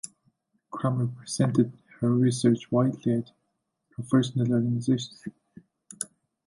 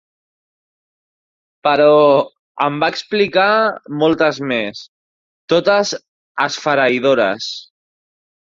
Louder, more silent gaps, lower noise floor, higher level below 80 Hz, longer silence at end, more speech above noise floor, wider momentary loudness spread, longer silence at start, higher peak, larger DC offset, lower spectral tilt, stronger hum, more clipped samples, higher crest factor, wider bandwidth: second, -26 LUFS vs -15 LUFS; second, none vs 2.39-2.55 s, 4.88-5.48 s, 6.08-6.35 s; second, -78 dBFS vs under -90 dBFS; second, -66 dBFS vs -60 dBFS; second, 0.4 s vs 0.85 s; second, 53 dB vs over 75 dB; first, 18 LU vs 15 LU; second, 0.05 s vs 1.65 s; second, -8 dBFS vs 0 dBFS; neither; first, -6.5 dB/octave vs -4.5 dB/octave; neither; neither; about the same, 18 dB vs 16 dB; first, 11.5 kHz vs 7.6 kHz